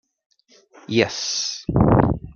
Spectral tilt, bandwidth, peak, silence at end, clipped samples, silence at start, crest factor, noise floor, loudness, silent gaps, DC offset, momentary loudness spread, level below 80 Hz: -5 dB/octave; 7.2 kHz; -2 dBFS; 0.05 s; under 0.1%; 0.9 s; 20 dB; -52 dBFS; -20 LUFS; none; under 0.1%; 7 LU; -36 dBFS